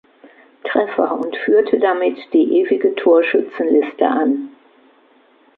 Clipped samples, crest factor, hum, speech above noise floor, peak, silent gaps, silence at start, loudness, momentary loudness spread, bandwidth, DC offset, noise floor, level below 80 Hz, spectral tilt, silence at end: under 0.1%; 16 dB; none; 37 dB; -2 dBFS; none; 0.65 s; -16 LUFS; 7 LU; 4.5 kHz; under 0.1%; -53 dBFS; -70 dBFS; -7.5 dB/octave; 1.1 s